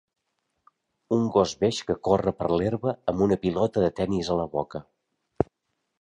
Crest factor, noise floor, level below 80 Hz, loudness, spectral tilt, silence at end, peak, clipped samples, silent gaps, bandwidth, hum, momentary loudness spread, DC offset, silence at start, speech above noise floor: 22 dB; -79 dBFS; -50 dBFS; -26 LUFS; -6.5 dB/octave; 0.55 s; -4 dBFS; under 0.1%; none; 10.5 kHz; none; 7 LU; under 0.1%; 1.1 s; 54 dB